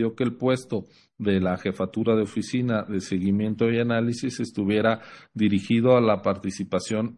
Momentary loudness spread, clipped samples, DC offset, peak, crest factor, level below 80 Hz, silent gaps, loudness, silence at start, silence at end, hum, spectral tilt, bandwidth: 9 LU; under 0.1%; under 0.1%; -8 dBFS; 16 dB; -64 dBFS; none; -24 LUFS; 0 s; 0 s; none; -6.5 dB/octave; 11.5 kHz